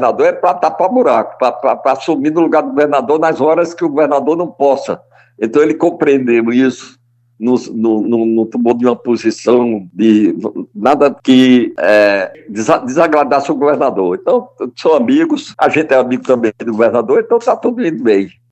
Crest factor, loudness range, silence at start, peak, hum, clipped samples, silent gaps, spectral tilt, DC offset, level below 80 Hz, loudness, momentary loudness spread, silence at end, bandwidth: 12 dB; 3 LU; 0 s; 0 dBFS; none; under 0.1%; none; -6 dB/octave; under 0.1%; -62 dBFS; -12 LUFS; 6 LU; 0.25 s; 8.4 kHz